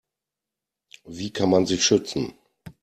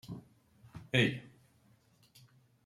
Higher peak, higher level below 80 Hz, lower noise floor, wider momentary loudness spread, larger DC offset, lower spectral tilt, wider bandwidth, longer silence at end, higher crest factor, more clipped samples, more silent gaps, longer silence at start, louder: first, -6 dBFS vs -14 dBFS; first, -58 dBFS vs -70 dBFS; first, -87 dBFS vs -68 dBFS; second, 15 LU vs 24 LU; neither; second, -4 dB/octave vs -5.5 dB/octave; about the same, 13.5 kHz vs 14 kHz; second, 0.1 s vs 1.4 s; second, 20 dB vs 26 dB; neither; neither; first, 1.05 s vs 0.05 s; first, -22 LUFS vs -32 LUFS